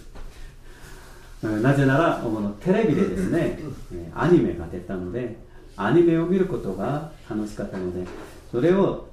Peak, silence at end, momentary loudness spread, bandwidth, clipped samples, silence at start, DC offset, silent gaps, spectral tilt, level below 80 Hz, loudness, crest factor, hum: -6 dBFS; 0 s; 15 LU; 13 kHz; under 0.1%; 0 s; under 0.1%; none; -8 dB/octave; -42 dBFS; -23 LUFS; 18 dB; none